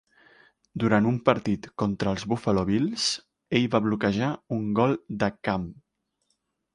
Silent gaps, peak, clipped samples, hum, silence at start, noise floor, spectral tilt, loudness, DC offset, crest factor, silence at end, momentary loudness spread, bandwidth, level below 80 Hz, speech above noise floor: none; -4 dBFS; under 0.1%; none; 0.75 s; -76 dBFS; -5.5 dB/octave; -26 LUFS; under 0.1%; 22 dB; 1 s; 7 LU; 11.5 kHz; -54 dBFS; 51 dB